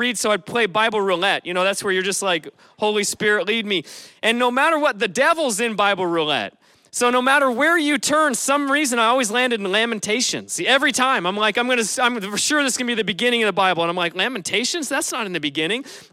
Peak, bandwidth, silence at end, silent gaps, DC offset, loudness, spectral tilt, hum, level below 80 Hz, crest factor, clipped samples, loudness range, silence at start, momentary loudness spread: -4 dBFS; 16 kHz; 0.1 s; none; under 0.1%; -19 LUFS; -2 dB/octave; none; -68 dBFS; 16 dB; under 0.1%; 2 LU; 0 s; 6 LU